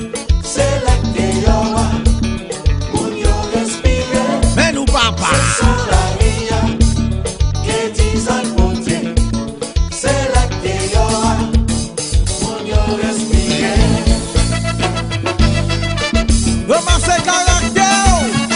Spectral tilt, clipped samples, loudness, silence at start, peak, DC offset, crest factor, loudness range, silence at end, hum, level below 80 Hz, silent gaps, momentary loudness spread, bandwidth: -4.5 dB/octave; under 0.1%; -15 LUFS; 0 s; 0 dBFS; under 0.1%; 14 dB; 2 LU; 0 s; none; -18 dBFS; none; 6 LU; 11 kHz